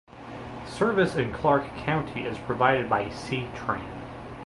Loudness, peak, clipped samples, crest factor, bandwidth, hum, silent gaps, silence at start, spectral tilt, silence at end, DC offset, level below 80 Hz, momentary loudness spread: -27 LUFS; -6 dBFS; under 0.1%; 22 dB; 11.5 kHz; none; none; 0.1 s; -6.5 dB/octave; 0 s; under 0.1%; -50 dBFS; 16 LU